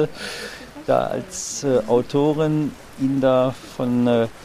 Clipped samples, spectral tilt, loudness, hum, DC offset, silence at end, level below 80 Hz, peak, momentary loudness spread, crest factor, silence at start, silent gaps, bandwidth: under 0.1%; -5.5 dB/octave; -21 LUFS; none; under 0.1%; 0 s; -52 dBFS; -4 dBFS; 12 LU; 16 dB; 0 s; none; 15 kHz